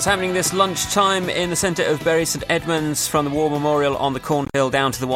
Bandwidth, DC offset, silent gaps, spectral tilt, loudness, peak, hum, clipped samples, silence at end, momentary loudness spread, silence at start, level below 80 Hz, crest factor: 16.5 kHz; under 0.1%; none; -3.5 dB/octave; -19 LUFS; -2 dBFS; none; under 0.1%; 0 s; 3 LU; 0 s; -46 dBFS; 16 dB